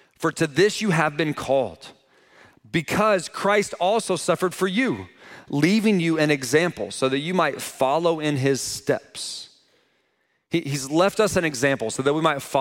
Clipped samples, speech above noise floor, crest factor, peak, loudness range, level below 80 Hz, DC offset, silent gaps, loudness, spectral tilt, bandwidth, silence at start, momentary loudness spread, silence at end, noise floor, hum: under 0.1%; 47 dB; 18 dB; -4 dBFS; 3 LU; -58 dBFS; under 0.1%; none; -22 LUFS; -4.5 dB/octave; 17 kHz; 0.2 s; 8 LU; 0 s; -70 dBFS; none